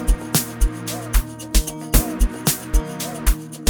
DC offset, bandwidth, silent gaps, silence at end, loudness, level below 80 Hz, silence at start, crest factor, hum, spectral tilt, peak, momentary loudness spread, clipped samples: under 0.1%; over 20 kHz; none; 0 s; -22 LUFS; -22 dBFS; 0 s; 20 dB; none; -4 dB/octave; 0 dBFS; 4 LU; under 0.1%